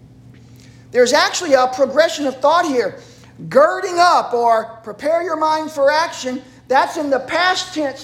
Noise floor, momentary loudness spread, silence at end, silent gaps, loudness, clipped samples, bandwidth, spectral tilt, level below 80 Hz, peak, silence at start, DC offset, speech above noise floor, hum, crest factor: -42 dBFS; 10 LU; 0 s; none; -16 LUFS; under 0.1%; 16 kHz; -2.5 dB/octave; -58 dBFS; -2 dBFS; 0.95 s; under 0.1%; 26 dB; none; 16 dB